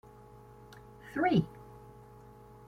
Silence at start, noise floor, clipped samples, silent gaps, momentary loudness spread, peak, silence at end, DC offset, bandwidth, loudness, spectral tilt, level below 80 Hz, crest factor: 0.75 s; -54 dBFS; under 0.1%; none; 26 LU; -16 dBFS; 0.9 s; under 0.1%; 15 kHz; -31 LUFS; -8 dB/octave; -62 dBFS; 22 dB